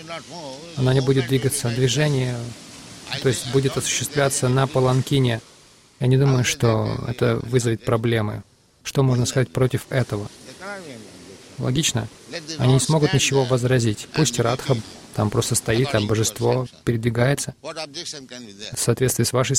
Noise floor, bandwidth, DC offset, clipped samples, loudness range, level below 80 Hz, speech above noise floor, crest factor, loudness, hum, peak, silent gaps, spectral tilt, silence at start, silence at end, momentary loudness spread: -43 dBFS; 16 kHz; under 0.1%; under 0.1%; 4 LU; -48 dBFS; 22 dB; 16 dB; -21 LUFS; none; -6 dBFS; none; -5 dB/octave; 0 s; 0 s; 16 LU